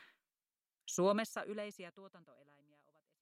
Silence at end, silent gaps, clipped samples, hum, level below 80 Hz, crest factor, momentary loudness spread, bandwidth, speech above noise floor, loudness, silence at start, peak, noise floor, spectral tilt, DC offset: 1 s; none; under 0.1%; none; under -90 dBFS; 20 dB; 23 LU; 16 kHz; over 50 dB; -38 LUFS; 0 s; -22 dBFS; under -90 dBFS; -4.5 dB/octave; under 0.1%